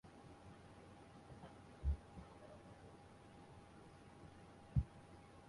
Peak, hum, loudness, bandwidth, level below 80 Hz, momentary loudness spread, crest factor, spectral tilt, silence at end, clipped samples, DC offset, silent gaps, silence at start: -26 dBFS; none; -52 LUFS; 11.5 kHz; -54 dBFS; 18 LU; 24 dB; -7.5 dB/octave; 0 s; under 0.1%; under 0.1%; none; 0.05 s